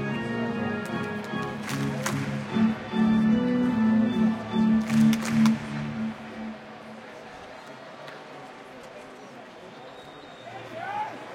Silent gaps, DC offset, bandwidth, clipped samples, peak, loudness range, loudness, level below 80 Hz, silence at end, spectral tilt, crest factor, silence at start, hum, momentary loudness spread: none; under 0.1%; 15.5 kHz; under 0.1%; -10 dBFS; 19 LU; -26 LUFS; -58 dBFS; 0 s; -6 dB/octave; 18 dB; 0 s; none; 21 LU